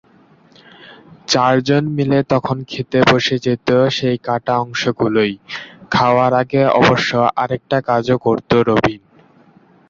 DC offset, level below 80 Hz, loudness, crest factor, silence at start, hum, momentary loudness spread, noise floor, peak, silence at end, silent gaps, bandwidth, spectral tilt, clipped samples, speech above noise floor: under 0.1%; -48 dBFS; -16 LUFS; 16 dB; 0.85 s; none; 8 LU; -50 dBFS; 0 dBFS; 0.9 s; none; 7.6 kHz; -5.5 dB/octave; under 0.1%; 34 dB